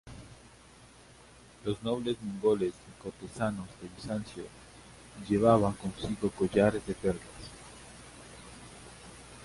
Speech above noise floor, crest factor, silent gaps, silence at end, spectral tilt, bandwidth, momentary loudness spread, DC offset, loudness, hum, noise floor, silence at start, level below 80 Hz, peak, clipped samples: 25 dB; 24 dB; none; 0 s; -6.5 dB/octave; 11.5 kHz; 22 LU; under 0.1%; -31 LUFS; none; -56 dBFS; 0.05 s; -56 dBFS; -10 dBFS; under 0.1%